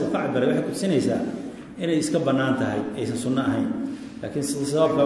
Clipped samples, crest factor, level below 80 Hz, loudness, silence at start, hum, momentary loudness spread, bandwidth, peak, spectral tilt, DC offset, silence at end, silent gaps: under 0.1%; 16 dB; -60 dBFS; -24 LUFS; 0 s; none; 9 LU; 12 kHz; -8 dBFS; -6 dB/octave; under 0.1%; 0 s; none